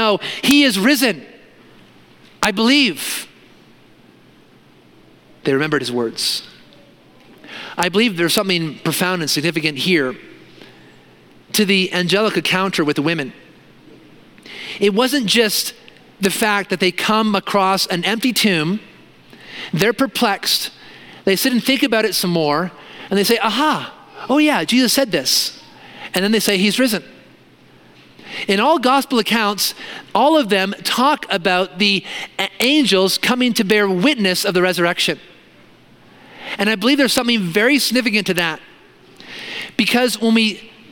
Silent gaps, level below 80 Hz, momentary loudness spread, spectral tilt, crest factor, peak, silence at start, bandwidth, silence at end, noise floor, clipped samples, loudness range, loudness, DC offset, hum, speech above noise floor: none; -60 dBFS; 12 LU; -3.5 dB/octave; 18 dB; 0 dBFS; 0 s; 17.5 kHz; 0.25 s; -49 dBFS; under 0.1%; 5 LU; -16 LUFS; under 0.1%; none; 32 dB